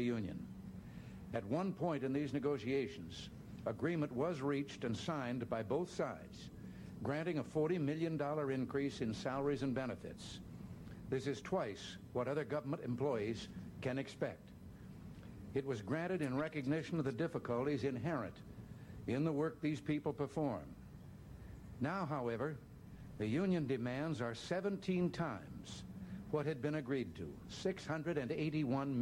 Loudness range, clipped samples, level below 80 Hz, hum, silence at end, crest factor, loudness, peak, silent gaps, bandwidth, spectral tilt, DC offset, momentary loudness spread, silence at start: 3 LU; under 0.1%; -64 dBFS; none; 0 s; 14 dB; -41 LUFS; -26 dBFS; none; 16.5 kHz; -7 dB/octave; under 0.1%; 14 LU; 0 s